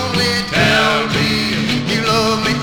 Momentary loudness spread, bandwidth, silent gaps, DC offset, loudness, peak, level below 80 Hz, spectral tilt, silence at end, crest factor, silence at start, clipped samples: 4 LU; 19 kHz; none; 0.2%; -14 LUFS; -2 dBFS; -38 dBFS; -4 dB/octave; 0 s; 14 dB; 0 s; under 0.1%